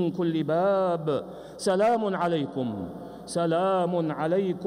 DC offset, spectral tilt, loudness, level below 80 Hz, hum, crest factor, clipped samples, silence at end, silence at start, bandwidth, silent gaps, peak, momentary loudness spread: under 0.1%; -6.5 dB/octave; -26 LUFS; -64 dBFS; none; 12 dB; under 0.1%; 0 s; 0 s; 15 kHz; none; -14 dBFS; 9 LU